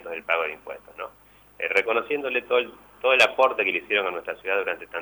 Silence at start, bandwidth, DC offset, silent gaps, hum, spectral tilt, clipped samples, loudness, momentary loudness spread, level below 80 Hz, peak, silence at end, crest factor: 0 s; over 20 kHz; under 0.1%; none; 50 Hz at -65 dBFS; -2 dB/octave; under 0.1%; -23 LUFS; 20 LU; -66 dBFS; -6 dBFS; 0 s; 18 dB